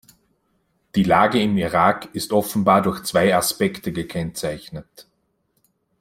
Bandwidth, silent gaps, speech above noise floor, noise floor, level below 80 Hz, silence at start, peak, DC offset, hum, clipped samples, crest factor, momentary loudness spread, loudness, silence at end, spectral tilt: 16.5 kHz; none; 49 dB; -68 dBFS; -52 dBFS; 0.95 s; -2 dBFS; under 0.1%; none; under 0.1%; 20 dB; 12 LU; -20 LUFS; 1 s; -5 dB/octave